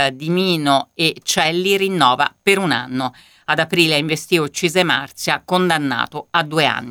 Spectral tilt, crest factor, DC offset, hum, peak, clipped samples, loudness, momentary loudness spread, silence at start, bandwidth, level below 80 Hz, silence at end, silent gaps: -4 dB/octave; 18 dB; under 0.1%; none; 0 dBFS; under 0.1%; -17 LUFS; 6 LU; 0 s; 19 kHz; -60 dBFS; 0 s; none